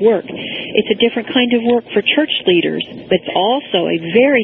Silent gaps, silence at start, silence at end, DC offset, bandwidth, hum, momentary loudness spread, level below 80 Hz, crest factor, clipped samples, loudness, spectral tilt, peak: none; 0 s; 0 s; under 0.1%; 4.1 kHz; none; 6 LU; -56 dBFS; 14 dB; under 0.1%; -15 LUFS; -9 dB/octave; 0 dBFS